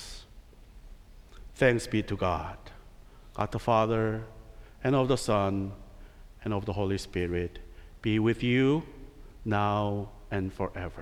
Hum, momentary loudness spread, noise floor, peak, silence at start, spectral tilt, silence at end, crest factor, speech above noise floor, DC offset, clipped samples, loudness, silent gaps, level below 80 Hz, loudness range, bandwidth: none; 20 LU; -51 dBFS; -10 dBFS; 0 s; -6.5 dB/octave; 0 s; 20 dB; 23 dB; under 0.1%; under 0.1%; -29 LUFS; none; -48 dBFS; 2 LU; 14.5 kHz